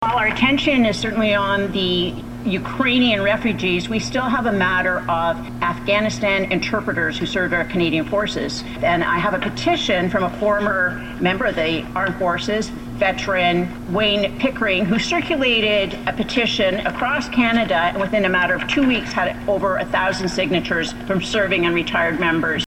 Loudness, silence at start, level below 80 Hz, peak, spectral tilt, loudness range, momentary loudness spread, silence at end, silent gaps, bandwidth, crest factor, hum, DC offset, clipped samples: -19 LUFS; 0 s; -40 dBFS; -4 dBFS; -5 dB/octave; 2 LU; 6 LU; 0 s; none; 16 kHz; 16 dB; none; under 0.1%; under 0.1%